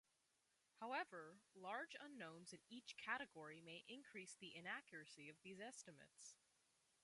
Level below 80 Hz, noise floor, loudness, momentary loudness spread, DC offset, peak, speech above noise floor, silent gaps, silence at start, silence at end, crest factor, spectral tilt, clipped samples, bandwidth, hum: under -90 dBFS; -86 dBFS; -55 LUFS; 12 LU; under 0.1%; -32 dBFS; 30 dB; none; 0.75 s; 0.7 s; 24 dB; -2.5 dB/octave; under 0.1%; 11.5 kHz; none